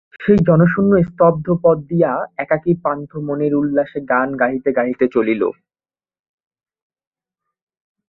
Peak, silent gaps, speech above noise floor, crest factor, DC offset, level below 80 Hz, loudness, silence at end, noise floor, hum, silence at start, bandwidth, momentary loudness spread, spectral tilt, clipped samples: -2 dBFS; none; over 74 dB; 16 dB; under 0.1%; -48 dBFS; -17 LUFS; 2.6 s; under -90 dBFS; none; 0.2 s; 4.1 kHz; 7 LU; -11 dB/octave; under 0.1%